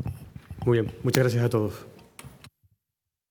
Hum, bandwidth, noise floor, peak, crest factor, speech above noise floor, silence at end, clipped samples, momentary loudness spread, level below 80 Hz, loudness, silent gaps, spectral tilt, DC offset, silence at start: none; 19 kHz; -86 dBFS; -4 dBFS; 24 dB; 62 dB; 0.85 s; under 0.1%; 24 LU; -54 dBFS; -26 LUFS; none; -6.5 dB/octave; under 0.1%; 0 s